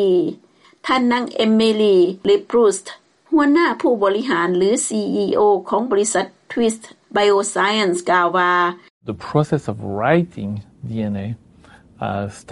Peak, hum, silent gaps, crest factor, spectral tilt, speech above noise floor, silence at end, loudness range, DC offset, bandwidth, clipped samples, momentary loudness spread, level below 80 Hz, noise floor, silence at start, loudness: 0 dBFS; none; 8.90-9.01 s; 18 dB; -4.5 dB/octave; 30 dB; 0 s; 5 LU; under 0.1%; 11.5 kHz; under 0.1%; 13 LU; -58 dBFS; -47 dBFS; 0 s; -18 LUFS